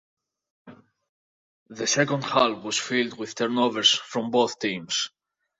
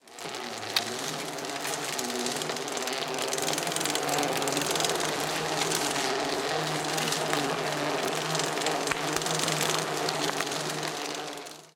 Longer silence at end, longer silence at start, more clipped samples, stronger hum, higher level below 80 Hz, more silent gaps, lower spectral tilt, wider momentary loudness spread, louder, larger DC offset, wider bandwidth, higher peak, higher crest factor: first, 0.5 s vs 0.05 s; first, 0.65 s vs 0.05 s; neither; neither; about the same, -70 dBFS vs -68 dBFS; first, 1.09-1.66 s vs none; about the same, -2.5 dB/octave vs -2 dB/octave; first, 9 LU vs 6 LU; first, -24 LUFS vs -29 LUFS; neither; second, 8.2 kHz vs 18 kHz; about the same, -6 dBFS vs -8 dBFS; about the same, 22 dB vs 22 dB